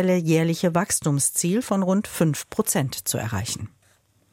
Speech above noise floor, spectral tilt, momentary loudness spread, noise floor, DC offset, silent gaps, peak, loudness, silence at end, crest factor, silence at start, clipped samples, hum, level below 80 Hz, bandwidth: 39 dB; -5 dB/octave; 7 LU; -62 dBFS; under 0.1%; none; -8 dBFS; -23 LUFS; 0.65 s; 16 dB; 0 s; under 0.1%; none; -58 dBFS; 16.5 kHz